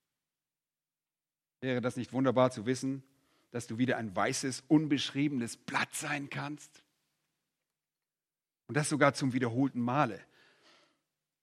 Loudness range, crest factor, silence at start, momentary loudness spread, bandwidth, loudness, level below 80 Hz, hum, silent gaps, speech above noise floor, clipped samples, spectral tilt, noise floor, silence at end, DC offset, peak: 6 LU; 24 dB; 1.6 s; 13 LU; 14 kHz; -32 LUFS; -78 dBFS; none; none; over 58 dB; under 0.1%; -5 dB/octave; under -90 dBFS; 1.2 s; under 0.1%; -10 dBFS